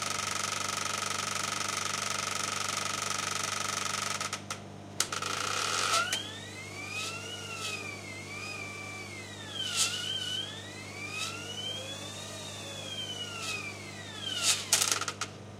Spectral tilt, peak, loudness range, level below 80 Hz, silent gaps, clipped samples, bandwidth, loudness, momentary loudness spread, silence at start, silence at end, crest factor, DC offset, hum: -1 dB/octave; -8 dBFS; 6 LU; -70 dBFS; none; under 0.1%; 16.5 kHz; -32 LUFS; 12 LU; 0 s; 0 s; 26 dB; under 0.1%; 50 Hz at -50 dBFS